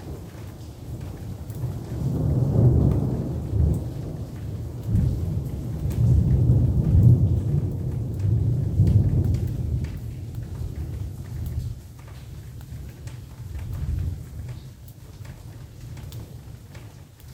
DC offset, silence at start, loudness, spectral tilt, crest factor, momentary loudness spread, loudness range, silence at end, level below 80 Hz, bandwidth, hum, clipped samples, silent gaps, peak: under 0.1%; 0 s; -24 LUFS; -9 dB/octave; 20 dB; 21 LU; 14 LU; 0 s; -34 dBFS; 15.5 kHz; none; under 0.1%; none; -4 dBFS